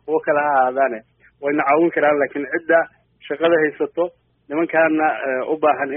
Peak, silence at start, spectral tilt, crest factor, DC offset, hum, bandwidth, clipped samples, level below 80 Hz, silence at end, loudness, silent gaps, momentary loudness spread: -4 dBFS; 0.05 s; -3.5 dB/octave; 16 dB; under 0.1%; none; 3.7 kHz; under 0.1%; -66 dBFS; 0 s; -19 LUFS; none; 9 LU